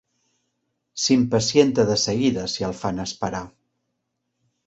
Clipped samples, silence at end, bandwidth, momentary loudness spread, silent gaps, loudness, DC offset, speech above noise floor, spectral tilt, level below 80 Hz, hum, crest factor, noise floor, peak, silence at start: under 0.1%; 1.2 s; 8.2 kHz; 11 LU; none; -21 LUFS; under 0.1%; 56 dB; -4.5 dB/octave; -52 dBFS; none; 20 dB; -77 dBFS; -2 dBFS; 0.95 s